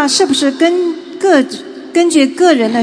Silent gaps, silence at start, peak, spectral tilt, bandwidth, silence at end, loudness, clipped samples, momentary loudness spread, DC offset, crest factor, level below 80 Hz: none; 0 s; 0 dBFS; -2.5 dB/octave; 10.5 kHz; 0 s; -12 LUFS; under 0.1%; 8 LU; under 0.1%; 12 dB; -64 dBFS